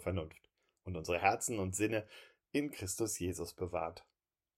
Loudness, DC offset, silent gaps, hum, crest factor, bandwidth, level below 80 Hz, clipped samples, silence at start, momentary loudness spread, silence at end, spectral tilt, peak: -37 LUFS; under 0.1%; none; none; 24 dB; 16 kHz; -68 dBFS; under 0.1%; 0 s; 19 LU; 0.6 s; -4.5 dB/octave; -14 dBFS